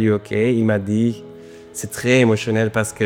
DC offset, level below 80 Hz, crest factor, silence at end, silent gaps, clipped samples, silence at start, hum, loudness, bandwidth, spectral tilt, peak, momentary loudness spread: under 0.1%; -56 dBFS; 18 dB; 0 s; none; under 0.1%; 0 s; none; -18 LUFS; 16.5 kHz; -6 dB/octave; -2 dBFS; 17 LU